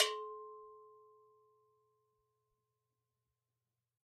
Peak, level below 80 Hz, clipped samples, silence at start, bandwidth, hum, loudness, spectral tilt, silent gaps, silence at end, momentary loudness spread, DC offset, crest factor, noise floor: -16 dBFS; under -90 dBFS; under 0.1%; 0 s; 6.4 kHz; none; -41 LUFS; 4.5 dB/octave; none; 3.05 s; 23 LU; under 0.1%; 32 dB; under -90 dBFS